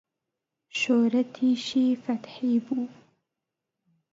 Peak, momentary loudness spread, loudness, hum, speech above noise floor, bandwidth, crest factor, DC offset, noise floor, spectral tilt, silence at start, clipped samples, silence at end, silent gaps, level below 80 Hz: -12 dBFS; 10 LU; -26 LUFS; none; 60 dB; 7.8 kHz; 16 dB; under 0.1%; -86 dBFS; -4.5 dB/octave; 0.75 s; under 0.1%; 1.2 s; none; -78 dBFS